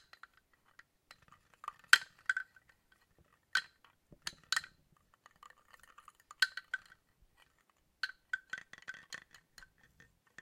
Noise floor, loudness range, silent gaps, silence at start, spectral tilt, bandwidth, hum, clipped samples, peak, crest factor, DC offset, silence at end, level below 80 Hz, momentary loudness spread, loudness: -75 dBFS; 11 LU; none; 1.65 s; 2 dB/octave; 16 kHz; none; under 0.1%; -6 dBFS; 36 dB; under 0.1%; 1.25 s; -78 dBFS; 30 LU; -36 LUFS